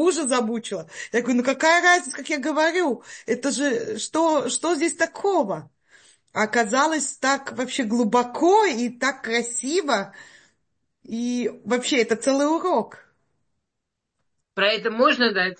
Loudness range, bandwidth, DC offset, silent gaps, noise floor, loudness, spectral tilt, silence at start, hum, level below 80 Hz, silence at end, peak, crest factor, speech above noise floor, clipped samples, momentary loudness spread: 4 LU; 8.8 kHz; under 0.1%; none; -81 dBFS; -22 LUFS; -2.5 dB/octave; 0 s; none; -74 dBFS; 0.05 s; -6 dBFS; 18 dB; 59 dB; under 0.1%; 9 LU